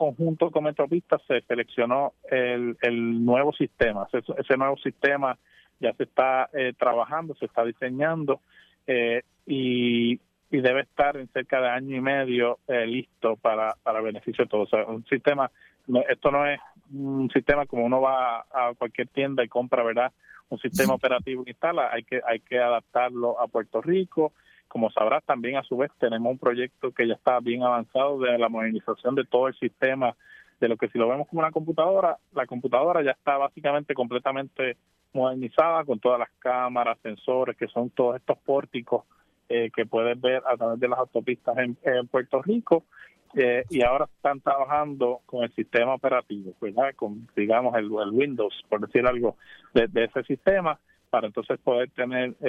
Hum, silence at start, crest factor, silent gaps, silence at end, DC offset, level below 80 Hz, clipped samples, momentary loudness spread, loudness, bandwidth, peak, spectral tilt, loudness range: none; 0 s; 20 dB; none; 0 s; under 0.1%; -58 dBFS; under 0.1%; 7 LU; -25 LUFS; 13 kHz; -4 dBFS; -6 dB/octave; 2 LU